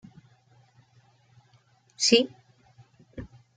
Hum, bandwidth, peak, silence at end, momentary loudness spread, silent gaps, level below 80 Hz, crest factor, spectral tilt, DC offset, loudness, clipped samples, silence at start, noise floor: none; 9.6 kHz; -6 dBFS; 0.3 s; 24 LU; none; -62 dBFS; 26 dB; -2.5 dB/octave; under 0.1%; -23 LUFS; under 0.1%; 2 s; -63 dBFS